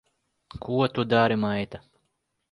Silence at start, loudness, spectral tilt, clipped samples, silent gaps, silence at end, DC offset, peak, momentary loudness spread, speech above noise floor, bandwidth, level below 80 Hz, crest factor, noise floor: 0.55 s; -25 LUFS; -8 dB/octave; under 0.1%; none; 0.75 s; under 0.1%; -8 dBFS; 21 LU; 52 dB; 11 kHz; -58 dBFS; 20 dB; -76 dBFS